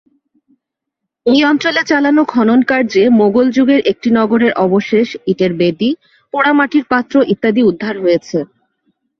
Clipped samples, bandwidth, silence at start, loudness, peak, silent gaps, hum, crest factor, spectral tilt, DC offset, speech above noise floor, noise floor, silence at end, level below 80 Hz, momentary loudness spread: under 0.1%; 6.6 kHz; 1.25 s; -13 LUFS; 0 dBFS; none; none; 12 dB; -6 dB/octave; under 0.1%; 65 dB; -77 dBFS; 0.75 s; -56 dBFS; 7 LU